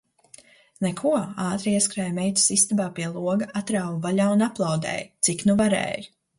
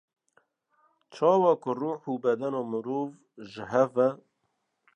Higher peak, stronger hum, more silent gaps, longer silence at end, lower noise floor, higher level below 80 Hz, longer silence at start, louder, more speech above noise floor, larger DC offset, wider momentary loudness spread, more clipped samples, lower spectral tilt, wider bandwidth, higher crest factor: first, -6 dBFS vs -10 dBFS; neither; neither; second, 0.3 s vs 0.8 s; second, -52 dBFS vs -78 dBFS; first, -60 dBFS vs -76 dBFS; second, 0.8 s vs 1.1 s; first, -23 LUFS vs -27 LUFS; second, 29 dB vs 51 dB; neither; second, 9 LU vs 18 LU; neither; second, -4 dB/octave vs -7.5 dB/octave; first, 11.5 kHz vs 8.4 kHz; about the same, 18 dB vs 20 dB